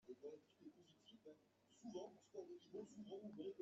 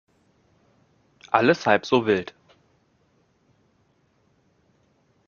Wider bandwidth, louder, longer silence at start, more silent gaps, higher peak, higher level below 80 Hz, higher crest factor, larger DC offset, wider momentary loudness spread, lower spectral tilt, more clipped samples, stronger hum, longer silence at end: first, 8 kHz vs 7.2 kHz; second, -58 LUFS vs -21 LUFS; second, 0.05 s vs 1.3 s; neither; second, -42 dBFS vs -2 dBFS; second, under -90 dBFS vs -66 dBFS; second, 16 dB vs 26 dB; neither; first, 12 LU vs 6 LU; first, -6 dB/octave vs -3.5 dB/octave; neither; neither; second, 0 s vs 3.05 s